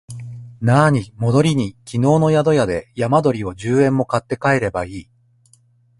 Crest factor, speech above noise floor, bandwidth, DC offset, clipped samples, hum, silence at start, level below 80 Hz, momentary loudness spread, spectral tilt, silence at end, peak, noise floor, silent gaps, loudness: 16 dB; 39 dB; 11.5 kHz; under 0.1%; under 0.1%; none; 0.1 s; -46 dBFS; 12 LU; -7 dB/octave; 1 s; 0 dBFS; -55 dBFS; none; -17 LUFS